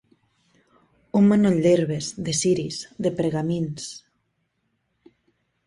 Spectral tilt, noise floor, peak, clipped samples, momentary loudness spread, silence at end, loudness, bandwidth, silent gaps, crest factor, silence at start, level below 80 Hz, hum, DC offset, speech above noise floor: -5.5 dB/octave; -73 dBFS; -8 dBFS; under 0.1%; 14 LU; 1.7 s; -22 LUFS; 11.5 kHz; none; 16 dB; 1.15 s; -60 dBFS; none; under 0.1%; 52 dB